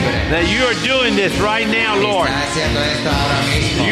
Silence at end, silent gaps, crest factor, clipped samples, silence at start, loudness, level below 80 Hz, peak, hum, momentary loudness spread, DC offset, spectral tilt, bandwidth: 0 s; none; 12 dB; under 0.1%; 0 s; -15 LUFS; -30 dBFS; -4 dBFS; none; 3 LU; under 0.1%; -4 dB/octave; 13.5 kHz